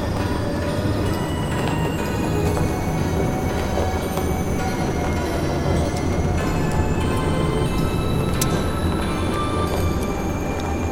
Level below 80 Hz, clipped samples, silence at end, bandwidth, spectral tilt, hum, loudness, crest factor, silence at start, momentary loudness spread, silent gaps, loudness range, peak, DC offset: -30 dBFS; under 0.1%; 0 s; 17 kHz; -6 dB/octave; none; -22 LUFS; 18 dB; 0 s; 2 LU; none; 1 LU; -4 dBFS; under 0.1%